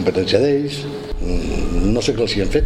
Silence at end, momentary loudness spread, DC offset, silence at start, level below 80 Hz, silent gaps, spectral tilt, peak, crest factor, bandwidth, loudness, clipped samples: 0 s; 10 LU; under 0.1%; 0 s; -24 dBFS; none; -5.5 dB/octave; -2 dBFS; 16 dB; 12.5 kHz; -19 LUFS; under 0.1%